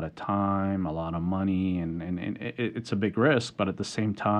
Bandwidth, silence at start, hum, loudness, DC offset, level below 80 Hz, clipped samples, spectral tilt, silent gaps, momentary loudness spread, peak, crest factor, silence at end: 10 kHz; 0 s; none; -29 LUFS; under 0.1%; -54 dBFS; under 0.1%; -6.5 dB/octave; none; 8 LU; -10 dBFS; 18 dB; 0 s